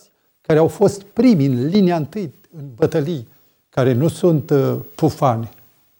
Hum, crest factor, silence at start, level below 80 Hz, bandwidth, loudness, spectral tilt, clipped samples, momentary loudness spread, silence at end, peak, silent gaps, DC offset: none; 16 dB; 0.5 s; -54 dBFS; 17 kHz; -17 LUFS; -7.5 dB/octave; under 0.1%; 14 LU; 0.5 s; -2 dBFS; none; under 0.1%